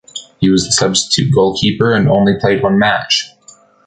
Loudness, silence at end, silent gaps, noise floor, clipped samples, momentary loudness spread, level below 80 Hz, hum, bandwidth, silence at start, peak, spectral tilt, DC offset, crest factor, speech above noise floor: -12 LUFS; 0.6 s; none; -44 dBFS; under 0.1%; 4 LU; -42 dBFS; none; 9.4 kHz; 0.15 s; 0 dBFS; -4.5 dB/octave; under 0.1%; 12 dB; 32 dB